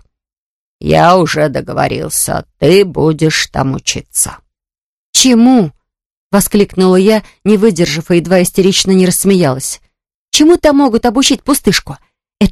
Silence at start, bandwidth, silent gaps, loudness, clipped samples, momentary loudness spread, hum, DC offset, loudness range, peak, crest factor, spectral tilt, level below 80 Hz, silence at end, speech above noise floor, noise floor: 0.8 s; 13.5 kHz; 4.81-5.13 s, 6.06-6.30 s, 10.15-10.32 s; -11 LUFS; 0.4%; 8 LU; none; under 0.1%; 2 LU; 0 dBFS; 12 dB; -4.5 dB/octave; -36 dBFS; 0 s; 75 dB; -85 dBFS